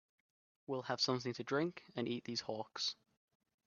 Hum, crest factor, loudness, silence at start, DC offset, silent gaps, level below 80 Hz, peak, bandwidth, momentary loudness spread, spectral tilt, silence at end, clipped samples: none; 20 dB; -40 LUFS; 0.7 s; under 0.1%; none; -82 dBFS; -22 dBFS; 7.2 kHz; 9 LU; -3 dB/octave; 0.75 s; under 0.1%